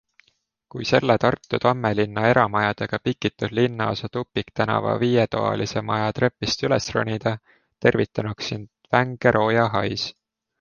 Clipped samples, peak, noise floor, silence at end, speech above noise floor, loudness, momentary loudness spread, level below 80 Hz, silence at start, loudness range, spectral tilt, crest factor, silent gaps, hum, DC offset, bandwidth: under 0.1%; -2 dBFS; -68 dBFS; 0.5 s; 46 dB; -22 LUFS; 9 LU; -52 dBFS; 0.75 s; 2 LU; -6 dB/octave; 20 dB; none; none; under 0.1%; 7.2 kHz